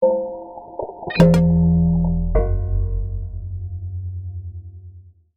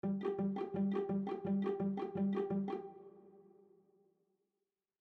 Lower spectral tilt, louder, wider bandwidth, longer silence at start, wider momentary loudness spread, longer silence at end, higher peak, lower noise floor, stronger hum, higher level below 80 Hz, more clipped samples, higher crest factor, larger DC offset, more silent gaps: second, -8.5 dB/octave vs -10.5 dB/octave; first, -20 LUFS vs -38 LUFS; first, 7.4 kHz vs 4.6 kHz; about the same, 0 s vs 0.05 s; first, 19 LU vs 10 LU; second, 0.25 s vs 1.6 s; first, -2 dBFS vs -26 dBFS; second, -43 dBFS vs under -90 dBFS; neither; first, -26 dBFS vs -80 dBFS; neither; about the same, 18 dB vs 14 dB; neither; neither